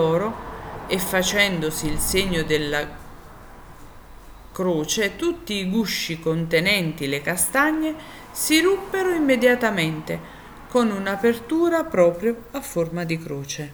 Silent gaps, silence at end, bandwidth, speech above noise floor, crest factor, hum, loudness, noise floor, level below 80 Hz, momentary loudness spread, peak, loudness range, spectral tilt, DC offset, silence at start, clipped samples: none; 0 s; over 20 kHz; 20 dB; 18 dB; none; -22 LUFS; -42 dBFS; -42 dBFS; 12 LU; -4 dBFS; 5 LU; -4 dB/octave; under 0.1%; 0 s; under 0.1%